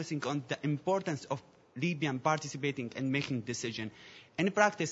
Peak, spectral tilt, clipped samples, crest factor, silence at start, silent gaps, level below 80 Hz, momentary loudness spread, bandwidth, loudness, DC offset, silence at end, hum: -10 dBFS; -4.5 dB/octave; under 0.1%; 24 dB; 0 s; none; -76 dBFS; 12 LU; 7.6 kHz; -34 LUFS; under 0.1%; 0 s; none